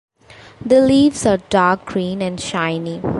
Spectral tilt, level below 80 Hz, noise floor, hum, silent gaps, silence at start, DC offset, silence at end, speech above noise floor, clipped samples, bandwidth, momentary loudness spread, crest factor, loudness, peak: -5.5 dB/octave; -46 dBFS; -43 dBFS; none; none; 0.3 s; under 0.1%; 0 s; 27 dB; under 0.1%; 11.5 kHz; 10 LU; 16 dB; -16 LUFS; -2 dBFS